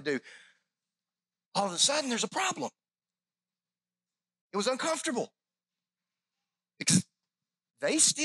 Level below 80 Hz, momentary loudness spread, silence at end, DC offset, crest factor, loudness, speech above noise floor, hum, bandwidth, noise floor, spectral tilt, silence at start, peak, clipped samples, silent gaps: -84 dBFS; 13 LU; 0 s; under 0.1%; 24 dB; -29 LUFS; over 60 dB; 60 Hz at -70 dBFS; 14 kHz; under -90 dBFS; -2.5 dB/octave; 0 s; -10 dBFS; under 0.1%; 1.46-1.52 s, 4.41-4.50 s